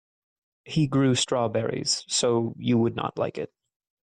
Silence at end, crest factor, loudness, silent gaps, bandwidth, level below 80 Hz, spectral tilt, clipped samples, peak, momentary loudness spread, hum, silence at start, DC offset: 0.55 s; 14 dB; -25 LUFS; none; 10.5 kHz; -60 dBFS; -4.5 dB/octave; under 0.1%; -12 dBFS; 8 LU; none; 0.65 s; under 0.1%